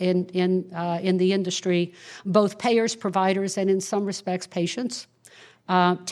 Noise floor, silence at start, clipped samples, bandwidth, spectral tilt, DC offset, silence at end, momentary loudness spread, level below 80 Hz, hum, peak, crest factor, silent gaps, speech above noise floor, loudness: -52 dBFS; 0 s; under 0.1%; 12.5 kHz; -5 dB/octave; under 0.1%; 0 s; 8 LU; -74 dBFS; none; -4 dBFS; 20 dB; none; 28 dB; -24 LUFS